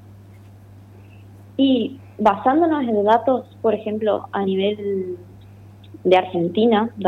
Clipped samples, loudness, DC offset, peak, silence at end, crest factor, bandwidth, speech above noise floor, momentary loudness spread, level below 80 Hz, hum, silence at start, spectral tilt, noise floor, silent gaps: under 0.1%; -20 LUFS; under 0.1%; -4 dBFS; 0 s; 16 dB; 7.2 kHz; 25 dB; 9 LU; -60 dBFS; none; 0.1 s; -8 dB/octave; -43 dBFS; none